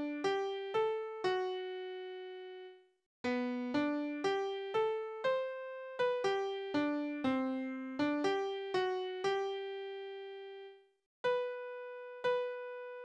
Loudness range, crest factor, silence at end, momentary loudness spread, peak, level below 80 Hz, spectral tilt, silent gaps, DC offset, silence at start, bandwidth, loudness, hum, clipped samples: 4 LU; 16 dB; 0 s; 12 LU; -22 dBFS; -80 dBFS; -4.5 dB/octave; 3.06-3.24 s, 11.06-11.24 s; under 0.1%; 0 s; 9.4 kHz; -37 LUFS; none; under 0.1%